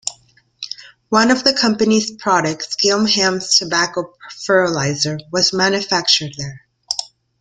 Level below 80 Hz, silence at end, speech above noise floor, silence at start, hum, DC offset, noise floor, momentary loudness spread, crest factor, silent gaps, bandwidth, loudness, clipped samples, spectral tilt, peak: -56 dBFS; 0.35 s; 36 dB; 0.05 s; none; under 0.1%; -53 dBFS; 16 LU; 18 dB; none; 11 kHz; -16 LUFS; under 0.1%; -3 dB/octave; 0 dBFS